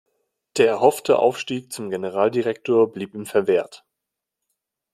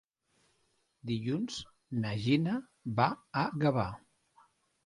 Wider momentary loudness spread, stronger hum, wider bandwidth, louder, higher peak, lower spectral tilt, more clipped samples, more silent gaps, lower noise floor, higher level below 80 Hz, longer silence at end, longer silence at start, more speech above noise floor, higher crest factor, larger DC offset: about the same, 12 LU vs 10 LU; neither; first, 14.5 kHz vs 11.5 kHz; first, -21 LUFS vs -33 LUFS; first, -2 dBFS vs -12 dBFS; second, -5 dB/octave vs -6.5 dB/octave; neither; neither; first, -84 dBFS vs -75 dBFS; second, -68 dBFS vs -62 dBFS; first, 1.2 s vs 0.9 s; second, 0.55 s vs 1.05 s; first, 63 dB vs 43 dB; about the same, 20 dB vs 22 dB; neither